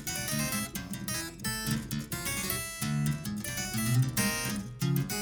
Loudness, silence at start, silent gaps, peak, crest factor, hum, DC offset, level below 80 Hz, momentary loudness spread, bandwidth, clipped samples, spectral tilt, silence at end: -32 LUFS; 0 s; none; -16 dBFS; 16 dB; none; under 0.1%; -50 dBFS; 6 LU; over 20 kHz; under 0.1%; -4 dB/octave; 0 s